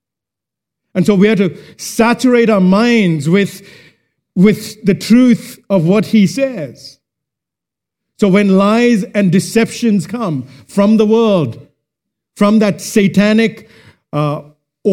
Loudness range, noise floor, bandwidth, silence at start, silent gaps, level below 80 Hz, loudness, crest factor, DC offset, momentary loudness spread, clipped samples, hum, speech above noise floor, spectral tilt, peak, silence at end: 3 LU; -84 dBFS; 16 kHz; 0.95 s; none; -52 dBFS; -12 LUFS; 12 dB; under 0.1%; 10 LU; under 0.1%; none; 72 dB; -6.5 dB/octave; 0 dBFS; 0 s